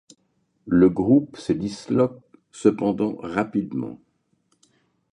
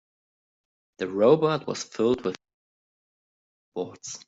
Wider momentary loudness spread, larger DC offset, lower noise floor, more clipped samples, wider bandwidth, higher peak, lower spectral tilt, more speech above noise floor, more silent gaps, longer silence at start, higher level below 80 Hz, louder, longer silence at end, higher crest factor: second, 9 LU vs 15 LU; neither; second, -69 dBFS vs under -90 dBFS; neither; first, 10.5 kHz vs 8 kHz; about the same, -4 dBFS vs -6 dBFS; first, -7.5 dB/octave vs -5.5 dB/octave; second, 48 dB vs over 65 dB; second, none vs 2.54-3.72 s; second, 0.65 s vs 1 s; first, -54 dBFS vs -66 dBFS; first, -22 LUFS vs -25 LUFS; first, 1.2 s vs 0.1 s; about the same, 20 dB vs 22 dB